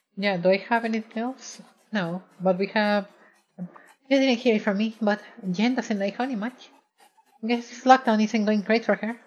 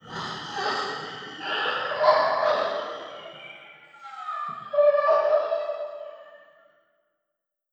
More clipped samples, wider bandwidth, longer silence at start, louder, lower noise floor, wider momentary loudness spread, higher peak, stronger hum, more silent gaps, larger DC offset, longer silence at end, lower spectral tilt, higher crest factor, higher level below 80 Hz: neither; about the same, 8.8 kHz vs 8.2 kHz; about the same, 0.15 s vs 0.05 s; about the same, -24 LUFS vs -25 LUFS; second, -60 dBFS vs -83 dBFS; second, 15 LU vs 20 LU; about the same, -2 dBFS vs -4 dBFS; neither; neither; neither; second, 0.1 s vs 1.35 s; first, -5.5 dB/octave vs -3.5 dB/octave; about the same, 24 dB vs 22 dB; second, under -90 dBFS vs -72 dBFS